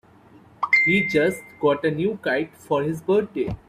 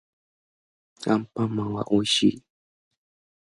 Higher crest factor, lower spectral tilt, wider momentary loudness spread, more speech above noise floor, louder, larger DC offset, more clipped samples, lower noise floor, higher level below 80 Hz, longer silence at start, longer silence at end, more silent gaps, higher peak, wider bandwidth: about the same, 16 dB vs 20 dB; about the same, -6 dB/octave vs -5 dB/octave; about the same, 9 LU vs 8 LU; second, 28 dB vs over 66 dB; about the same, -22 LUFS vs -24 LUFS; neither; neither; second, -51 dBFS vs under -90 dBFS; first, -52 dBFS vs -60 dBFS; second, 0.6 s vs 1 s; second, 0.1 s vs 1 s; neither; about the same, -6 dBFS vs -8 dBFS; first, 15 kHz vs 11.5 kHz